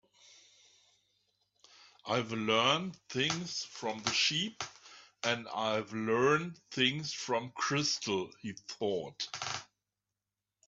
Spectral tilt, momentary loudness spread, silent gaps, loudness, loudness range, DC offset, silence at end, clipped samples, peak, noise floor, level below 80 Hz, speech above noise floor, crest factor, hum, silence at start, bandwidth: -3 dB/octave; 12 LU; none; -33 LUFS; 3 LU; under 0.1%; 1.05 s; under 0.1%; -14 dBFS; under -90 dBFS; -76 dBFS; over 56 dB; 22 dB; 50 Hz at -70 dBFS; 2.05 s; 8.2 kHz